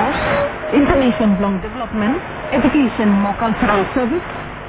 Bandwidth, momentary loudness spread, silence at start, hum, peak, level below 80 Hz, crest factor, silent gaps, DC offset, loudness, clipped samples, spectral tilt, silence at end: 4 kHz; 8 LU; 0 s; none; 0 dBFS; -34 dBFS; 16 dB; none; under 0.1%; -17 LUFS; under 0.1%; -10.5 dB/octave; 0 s